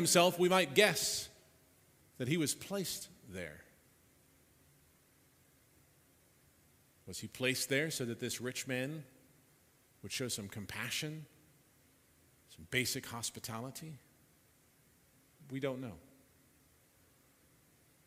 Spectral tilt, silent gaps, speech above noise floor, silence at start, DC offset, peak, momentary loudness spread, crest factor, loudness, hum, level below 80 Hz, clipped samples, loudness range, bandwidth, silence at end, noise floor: -3 dB/octave; none; 33 dB; 0 s; under 0.1%; -12 dBFS; 21 LU; 28 dB; -36 LUFS; none; -74 dBFS; under 0.1%; 13 LU; 16 kHz; 2.05 s; -69 dBFS